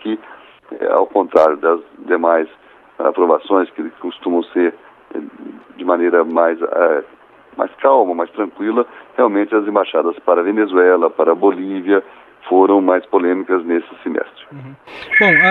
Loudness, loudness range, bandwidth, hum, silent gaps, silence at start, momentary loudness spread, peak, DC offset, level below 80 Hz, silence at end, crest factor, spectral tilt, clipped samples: -15 LUFS; 4 LU; 5.6 kHz; none; none; 0.05 s; 17 LU; 0 dBFS; under 0.1%; -66 dBFS; 0 s; 16 dB; -7.5 dB/octave; under 0.1%